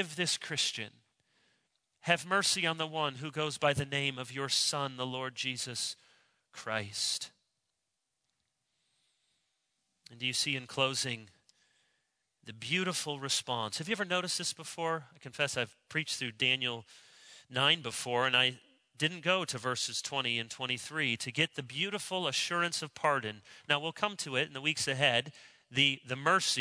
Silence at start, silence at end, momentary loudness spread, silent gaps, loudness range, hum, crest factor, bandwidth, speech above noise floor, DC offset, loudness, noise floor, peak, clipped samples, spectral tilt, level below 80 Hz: 0 s; 0 s; 9 LU; none; 7 LU; none; 24 dB; 11 kHz; 51 dB; under 0.1%; -32 LUFS; -85 dBFS; -10 dBFS; under 0.1%; -2.5 dB/octave; -74 dBFS